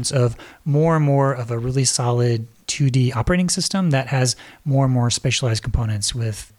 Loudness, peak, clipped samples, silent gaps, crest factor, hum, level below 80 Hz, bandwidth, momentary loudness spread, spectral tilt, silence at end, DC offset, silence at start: -20 LUFS; -4 dBFS; under 0.1%; none; 14 dB; none; -36 dBFS; 13 kHz; 5 LU; -5 dB/octave; 0.15 s; under 0.1%; 0 s